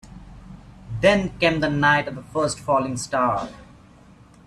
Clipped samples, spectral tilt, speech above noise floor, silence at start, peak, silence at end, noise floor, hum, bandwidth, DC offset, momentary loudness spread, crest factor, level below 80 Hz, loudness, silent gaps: under 0.1%; -5 dB/octave; 28 dB; 0.05 s; -4 dBFS; 0.85 s; -49 dBFS; none; 13 kHz; under 0.1%; 10 LU; 20 dB; -46 dBFS; -21 LUFS; none